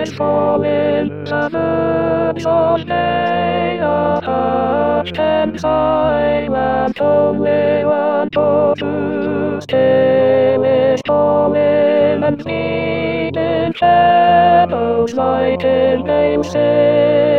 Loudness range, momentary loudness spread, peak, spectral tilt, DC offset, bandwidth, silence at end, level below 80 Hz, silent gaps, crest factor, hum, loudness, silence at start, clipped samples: 3 LU; 6 LU; 0 dBFS; -7 dB/octave; 0.5%; 7.2 kHz; 0 s; -44 dBFS; none; 14 dB; none; -14 LUFS; 0 s; under 0.1%